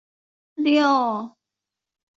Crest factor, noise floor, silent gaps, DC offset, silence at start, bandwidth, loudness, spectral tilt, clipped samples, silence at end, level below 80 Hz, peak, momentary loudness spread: 18 dB; -86 dBFS; none; under 0.1%; 0.6 s; 7.6 kHz; -21 LUFS; -4.5 dB/octave; under 0.1%; 0.9 s; -74 dBFS; -8 dBFS; 21 LU